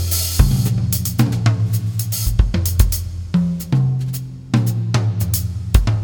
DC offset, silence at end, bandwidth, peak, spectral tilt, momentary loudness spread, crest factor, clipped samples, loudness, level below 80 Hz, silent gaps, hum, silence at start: under 0.1%; 0 s; 19.5 kHz; 0 dBFS; -5.5 dB/octave; 5 LU; 16 dB; under 0.1%; -19 LUFS; -24 dBFS; none; none; 0 s